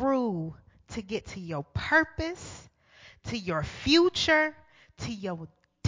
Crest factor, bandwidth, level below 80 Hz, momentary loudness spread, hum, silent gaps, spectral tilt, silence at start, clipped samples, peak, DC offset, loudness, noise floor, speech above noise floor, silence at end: 20 dB; 7.6 kHz; -50 dBFS; 19 LU; none; none; -4.5 dB/octave; 0 s; under 0.1%; -10 dBFS; under 0.1%; -28 LUFS; -56 dBFS; 28 dB; 0 s